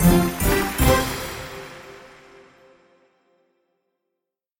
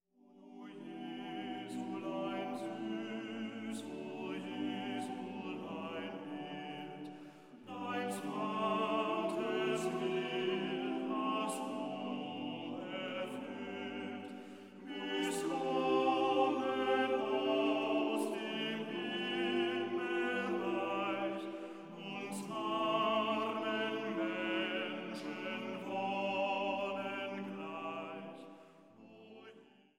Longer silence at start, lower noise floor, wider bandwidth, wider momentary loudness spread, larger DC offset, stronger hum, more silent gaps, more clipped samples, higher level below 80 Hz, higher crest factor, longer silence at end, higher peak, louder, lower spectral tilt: second, 0 s vs 0.3 s; first, -83 dBFS vs -61 dBFS; about the same, 17 kHz vs 17 kHz; first, 23 LU vs 14 LU; neither; neither; neither; neither; first, -32 dBFS vs -90 dBFS; about the same, 22 dB vs 18 dB; first, 2.5 s vs 0.3 s; first, -2 dBFS vs -20 dBFS; first, -21 LUFS vs -38 LUFS; about the same, -5 dB/octave vs -4.5 dB/octave